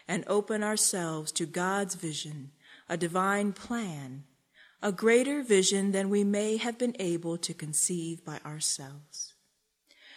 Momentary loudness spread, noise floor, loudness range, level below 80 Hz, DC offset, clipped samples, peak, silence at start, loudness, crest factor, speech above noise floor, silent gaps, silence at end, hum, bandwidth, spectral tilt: 15 LU; -74 dBFS; 5 LU; -74 dBFS; under 0.1%; under 0.1%; -12 dBFS; 0.1 s; -29 LUFS; 18 dB; 45 dB; none; 0 s; none; 16 kHz; -3.5 dB/octave